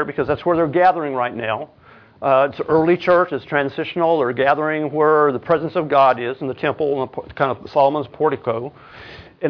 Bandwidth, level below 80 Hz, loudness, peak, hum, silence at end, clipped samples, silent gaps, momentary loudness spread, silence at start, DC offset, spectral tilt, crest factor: 5.4 kHz; -54 dBFS; -19 LUFS; -2 dBFS; none; 0 s; under 0.1%; none; 10 LU; 0 s; under 0.1%; -8.5 dB/octave; 16 dB